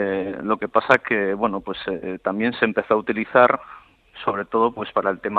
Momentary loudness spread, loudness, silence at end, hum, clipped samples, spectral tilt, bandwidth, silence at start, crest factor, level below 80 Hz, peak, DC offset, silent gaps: 10 LU; -21 LUFS; 0 s; none; under 0.1%; -7 dB/octave; 8 kHz; 0 s; 20 dB; -58 dBFS; -2 dBFS; under 0.1%; none